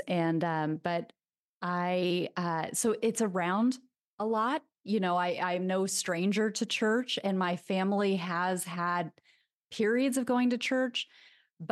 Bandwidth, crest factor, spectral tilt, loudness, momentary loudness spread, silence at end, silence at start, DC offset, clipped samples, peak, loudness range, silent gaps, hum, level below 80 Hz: 12.5 kHz; 16 dB; -4.5 dB/octave; -31 LUFS; 7 LU; 0.05 s; 0 s; under 0.1%; under 0.1%; -14 dBFS; 2 LU; 1.39-1.61 s, 4.01-4.18 s, 9.53-9.68 s, 11.53-11.57 s; none; -82 dBFS